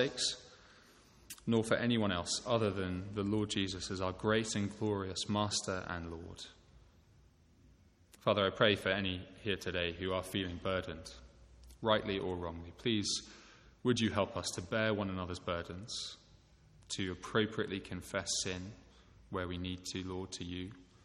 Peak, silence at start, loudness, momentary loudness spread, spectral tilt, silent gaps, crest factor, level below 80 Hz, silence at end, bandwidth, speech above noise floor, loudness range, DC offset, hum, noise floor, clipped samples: -14 dBFS; 0 s; -36 LUFS; 13 LU; -4 dB/octave; none; 24 dB; -62 dBFS; 0.2 s; 15.5 kHz; 29 dB; 5 LU; under 0.1%; none; -65 dBFS; under 0.1%